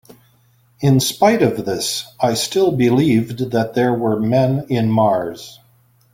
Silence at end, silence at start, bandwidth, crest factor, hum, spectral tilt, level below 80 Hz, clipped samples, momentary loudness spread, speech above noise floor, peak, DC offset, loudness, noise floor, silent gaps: 0.6 s; 0.8 s; 16.5 kHz; 16 dB; none; -5.5 dB/octave; -52 dBFS; under 0.1%; 7 LU; 39 dB; -2 dBFS; under 0.1%; -17 LUFS; -55 dBFS; none